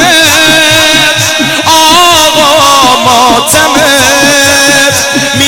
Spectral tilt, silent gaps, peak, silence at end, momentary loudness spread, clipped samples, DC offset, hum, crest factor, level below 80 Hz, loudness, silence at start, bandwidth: -1.5 dB/octave; none; 0 dBFS; 0 s; 4 LU; 2%; 2%; none; 6 dB; -36 dBFS; -3 LUFS; 0 s; over 20 kHz